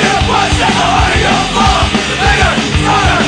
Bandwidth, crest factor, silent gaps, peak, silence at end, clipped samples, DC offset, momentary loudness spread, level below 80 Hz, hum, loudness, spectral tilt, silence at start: 10 kHz; 10 dB; none; 0 dBFS; 0 s; under 0.1%; under 0.1%; 2 LU; -20 dBFS; none; -10 LUFS; -4 dB/octave; 0 s